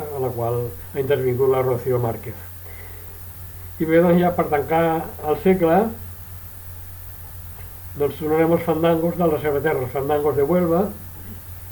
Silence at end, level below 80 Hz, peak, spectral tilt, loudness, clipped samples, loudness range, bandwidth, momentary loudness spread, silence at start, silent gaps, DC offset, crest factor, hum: 0 s; -46 dBFS; -6 dBFS; -7.5 dB/octave; -20 LUFS; under 0.1%; 4 LU; 19.5 kHz; 17 LU; 0 s; none; under 0.1%; 14 dB; none